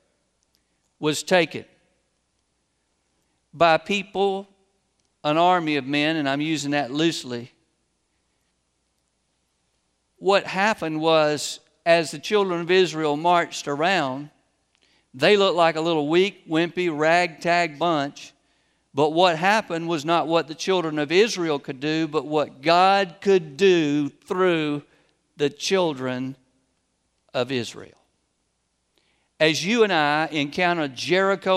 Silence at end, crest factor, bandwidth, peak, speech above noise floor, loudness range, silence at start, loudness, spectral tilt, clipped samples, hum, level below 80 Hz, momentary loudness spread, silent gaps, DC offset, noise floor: 0 s; 20 dB; 14 kHz; -2 dBFS; 51 dB; 7 LU; 1 s; -22 LUFS; -4.5 dB/octave; under 0.1%; none; -70 dBFS; 9 LU; none; under 0.1%; -72 dBFS